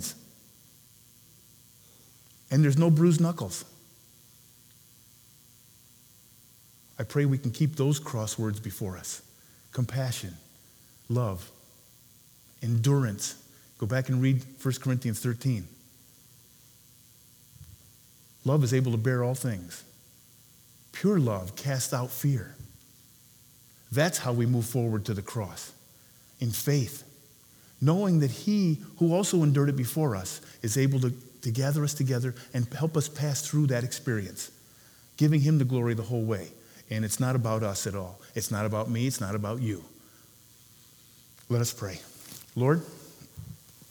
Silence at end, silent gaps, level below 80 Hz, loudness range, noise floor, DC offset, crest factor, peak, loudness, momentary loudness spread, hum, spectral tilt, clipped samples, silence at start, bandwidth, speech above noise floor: 0.35 s; none; -66 dBFS; 8 LU; -57 dBFS; under 0.1%; 20 dB; -10 dBFS; -28 LUFS; 17 LU; 60 Hz at -55 dBFS; -6 dB/octave; under 0.1%; 0 s; over 20 kHz; 30 dB